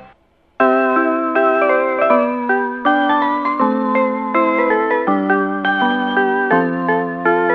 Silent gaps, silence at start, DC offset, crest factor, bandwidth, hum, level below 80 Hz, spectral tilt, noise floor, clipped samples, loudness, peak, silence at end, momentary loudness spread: none; 0 s; under 0.1%; 16 dB; 5.8 kHz; none; -60 dBFS; -8 dB/octave; -53 dBFS; under 0.1%; -16 LUFS; 0 dBFS; 0 s; 3 LU